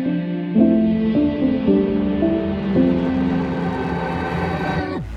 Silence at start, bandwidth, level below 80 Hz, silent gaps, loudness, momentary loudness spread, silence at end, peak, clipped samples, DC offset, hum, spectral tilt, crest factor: 0 s; 6.6 kHz; -38 dBFS; none; -19 LUFS; 7 LU; 0 s; -4 dBFS; under 0.1%; under 0.1%; none; -9 dB/octave; 14 dB